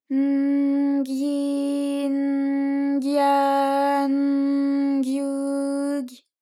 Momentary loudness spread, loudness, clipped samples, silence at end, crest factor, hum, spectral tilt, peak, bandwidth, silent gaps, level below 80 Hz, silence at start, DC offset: 5 LU; -22 LUFS; under 0.1%; 0.25 s; 12 dB; none; -4 dB/octave; -10 dBFS; 12.5 kHz; none; under -90 dBFS; 0.1 s; under 0.1%